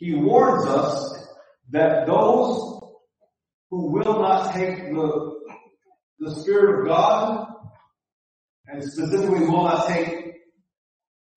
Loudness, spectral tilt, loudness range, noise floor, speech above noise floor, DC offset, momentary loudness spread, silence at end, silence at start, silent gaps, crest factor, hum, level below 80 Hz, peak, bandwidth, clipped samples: -21 LUFS; -6.5 dB/octave; 3 LU; -69 dBFS; 49 dB; under 0.1%; 18 LU; 1 s; 0 s; 3.54-3.70 s, 6.03-6.17 s, 8.12-8.64 s; 18 dB; none; -64 dBFS; -4 dBFS; 8.8 kHz; under 0.1%